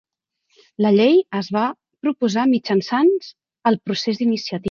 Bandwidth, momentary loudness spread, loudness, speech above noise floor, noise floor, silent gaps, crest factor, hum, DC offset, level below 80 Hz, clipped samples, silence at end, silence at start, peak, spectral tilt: 7.2 kHz; 9 LU; -19 LUFS; 50 dB; -69 dBFS; none; 16 dB; none; under 0.1%; -62 dBFS; under 0.1%; 0 s; 0.8 s; -4 dBFS; -6 dB/octave